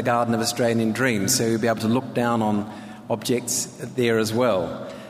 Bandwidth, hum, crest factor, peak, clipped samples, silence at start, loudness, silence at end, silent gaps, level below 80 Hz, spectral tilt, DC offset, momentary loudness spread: 15.5 kHz; none; 14 dB; -8 dBFS; under 0.1%; 0 s; -22 LUFS; 0 s; none; -62 dBFS; -4.5 dB/octave; under 0.1%; 8 LU